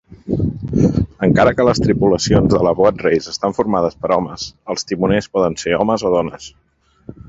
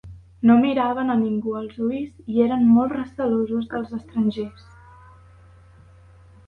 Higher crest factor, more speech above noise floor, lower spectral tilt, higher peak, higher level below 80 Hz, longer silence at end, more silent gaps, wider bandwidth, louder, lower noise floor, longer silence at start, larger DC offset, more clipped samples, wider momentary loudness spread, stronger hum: about the same, 16 dB vs 18 dB; second, 24 dB vs 28 dB; second, -6 dB/octave vs -9 dB/octave; first, 0 dBFS vs -6 dBFS; first, -36 dBFS vs -52 dBFS; second, 0.15 s vs 2 s; neither; first, 8 kHz vs 4.4 kHz; first, -16 LUFS vs -21 LUFS; second, -39 dBFS vs -49 dBFS; about the same, 0.1 s vs 0.05 s; neither; neither; about the same, 10 LU vs 12 LU; neither